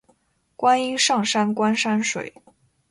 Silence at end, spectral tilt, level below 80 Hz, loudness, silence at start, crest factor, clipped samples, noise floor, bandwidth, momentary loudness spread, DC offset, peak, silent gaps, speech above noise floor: 0.6 s; -3 dB/octave; -68 dBFS; -21 LUFS; 0.6 s; 16 dB; under 0.1%; -63 dBFS; 11.5 kHz; 8 LU; under 0.1%; -6 dBFS; none; 42 dB